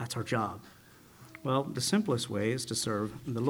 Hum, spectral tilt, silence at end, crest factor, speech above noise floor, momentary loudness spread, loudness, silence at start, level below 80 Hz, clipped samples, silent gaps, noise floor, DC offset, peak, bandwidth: none; -4.5 dB/octave; 0 s; 18 dB; 24 dB; 9 LU; -32 LUFS; 0 s; -66 dBFS; under 0.1%; none; -56 dBFS; under 0.1%; -14 dBFS; over 20 kHz